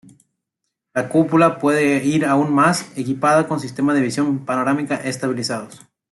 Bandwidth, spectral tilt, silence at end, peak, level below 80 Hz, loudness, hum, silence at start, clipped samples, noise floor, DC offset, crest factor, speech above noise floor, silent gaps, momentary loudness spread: 12 kHz; -5.5 dB/octave; 0.35 s; -2 dBFS; -62 dBFS; -18 LUFS; none; 0.95 s; under 0.1%; -78 dBFS; under 0.1%; 16 dB; 61 dB; none; 10 LU